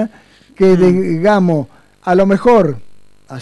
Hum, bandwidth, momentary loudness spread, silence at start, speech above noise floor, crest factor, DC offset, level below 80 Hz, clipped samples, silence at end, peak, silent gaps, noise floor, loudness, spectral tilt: 50 Hz at -45 dBFS; 11 kHz; 17 LU; 0 s; 34 dB; 10 dB; under 0.1%; -44 dBFS; under 0.1%; 0 s; -2 dBFS; none; -44 dBFS; -12 LUFS; -8 dB/octave